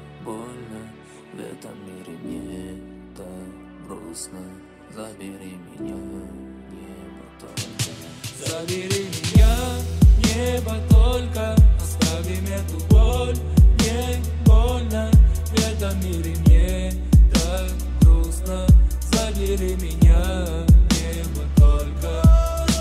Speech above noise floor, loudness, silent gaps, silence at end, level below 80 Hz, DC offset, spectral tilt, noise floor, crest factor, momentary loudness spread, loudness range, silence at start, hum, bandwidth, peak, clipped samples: 21 dB; -19 LUFS; none; 0 s; -20 dBFS; under 0.1%; -6 dB/octave; -42 dBFS; 14 dB; 22 LU; 18 LU; 0 s; none; 15 kHz; -4 dBFS; under 0.1%